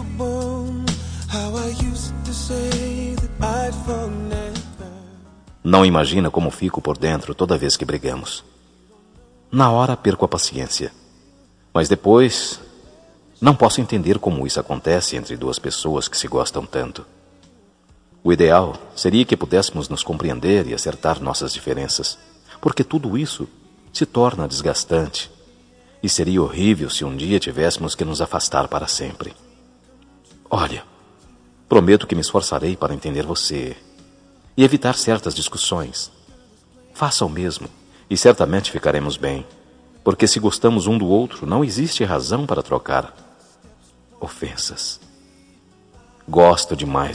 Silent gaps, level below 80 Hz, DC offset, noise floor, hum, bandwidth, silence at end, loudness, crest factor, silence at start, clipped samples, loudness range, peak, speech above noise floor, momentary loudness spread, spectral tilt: none; -38 dBFS; under 0.1%; -53 dBFS; none; 10.5 kHz; 0 s; -19 LUFS; 20 dB; 0 s; under 0.1%; 6 LU; 0 dBFS; 35 dB; 14 LU; -4.5 dB/octave